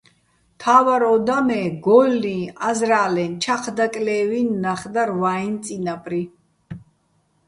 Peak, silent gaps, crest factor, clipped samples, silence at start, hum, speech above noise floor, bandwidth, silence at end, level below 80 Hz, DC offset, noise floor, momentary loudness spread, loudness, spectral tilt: -2 dBFS; none; 18 dB; under 0.1%; 0.6 s; none; 45 dB; 11.5 kHz; 0.7 s; -60 dBFS; under 0.1%; -64 dBFS; 12 LU; -20 LUFS; -5 dB/octave